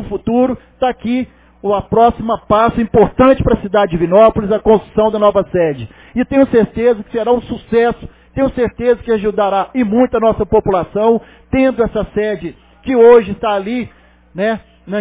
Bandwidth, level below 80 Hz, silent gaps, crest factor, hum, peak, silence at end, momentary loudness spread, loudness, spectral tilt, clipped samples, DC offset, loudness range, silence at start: 4 kHz; -34 dBFS; none; 14 dB; none; 0 dBFS; 0 s; 11 LU; -14 LUFS; -11 dB/octave; under 0.1%; under 0.1%; 3 LU; 0 s